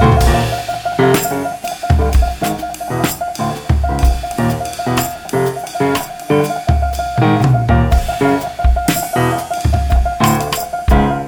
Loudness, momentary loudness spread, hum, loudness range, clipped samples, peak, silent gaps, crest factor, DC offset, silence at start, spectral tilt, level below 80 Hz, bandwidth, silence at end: -16 LUFS; 7 LU; none; 3 LU; under 0.1%; 0 dBFS; none; 14 dB; under 0.1%; 0 s; -6 dB/octave; -20 dBFS; over 20 kHz; 0 s